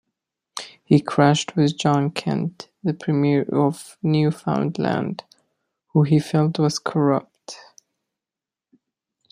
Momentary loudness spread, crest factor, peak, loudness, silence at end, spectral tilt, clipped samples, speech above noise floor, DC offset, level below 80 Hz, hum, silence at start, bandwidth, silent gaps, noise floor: 17 LU; 20 dB; -2 dBFS; -21 LUFS; 1.75 s; -6.5 dB/octave; under 0.1%; 70 dB; under 0.1%; -62 dBFS; none; 0.55 s; 11 kHz; none; -89 dBFS